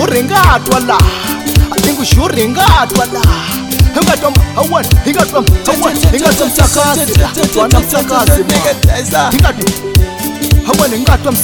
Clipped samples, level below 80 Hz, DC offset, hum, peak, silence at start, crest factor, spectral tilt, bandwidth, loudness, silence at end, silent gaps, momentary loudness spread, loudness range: 0.1%; -16 dBFS; under 0.1%; none; 0 dBFS; 0 s; 10 dB; -4.5 dB/octave; 19.5 kHz; -10 LUFS; 0 s; none; 4 LU; 1 LU